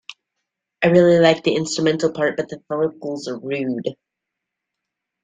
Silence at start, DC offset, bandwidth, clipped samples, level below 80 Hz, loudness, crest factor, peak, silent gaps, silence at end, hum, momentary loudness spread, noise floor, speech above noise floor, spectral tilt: 0.1 s; under 0.1%; 9.4 kHz; under 0.1%; -60 dBFS; -19 LUFS; 18 dB; -2 dBFS; none; 1.3 s; none; 14 LU; -82 dBFS; 64 dB; -5.5 dB/octave